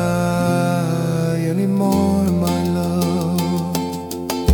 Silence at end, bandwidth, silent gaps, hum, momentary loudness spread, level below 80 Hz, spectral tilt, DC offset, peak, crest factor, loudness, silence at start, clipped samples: 0 s; 19 kHz; none; none; 6 LU; -38 dBFS; -6.5 dB/octave; under 0.1%; -2 dBFS; 16 dB; -19 LUFS; 0 s; under 0.1%